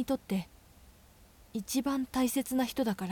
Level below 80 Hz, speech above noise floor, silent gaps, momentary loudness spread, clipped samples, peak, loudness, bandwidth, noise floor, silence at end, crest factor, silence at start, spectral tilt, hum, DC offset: -60 dBFS; 27 dB; none; 11 LU; under 0.1%; -18 dBFS; -33 LUFS; 18 kHz; -59 dBFS; 0 s; 16 dB; 0 s; -4.5 dB/octave; none; under 0.1%